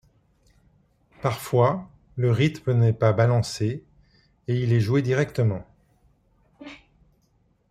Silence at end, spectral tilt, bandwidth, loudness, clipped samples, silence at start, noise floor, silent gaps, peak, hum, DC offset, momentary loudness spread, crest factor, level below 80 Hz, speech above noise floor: 0.95 s; -7 dB/octave; 14 kHz; -23 LUFS; under 0.1%; 1.25 s; -65 dBFS; none; -6 dBFS; none; under 0.1%; 18 LU; 20 dB; -56 dBFS; 44 dB